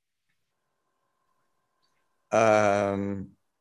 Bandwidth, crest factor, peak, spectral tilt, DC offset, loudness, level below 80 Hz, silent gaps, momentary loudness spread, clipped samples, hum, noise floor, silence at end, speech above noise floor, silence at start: 11.5 kHz; 20 dB; -8 dBFS; -5.5 dB/octave; under 0.1%; -24 LUFS; -62 dBFS; none; 13 LU; under 0.1%; none; -81 dBFS; 0.35 s; 57 dB; 2.3 s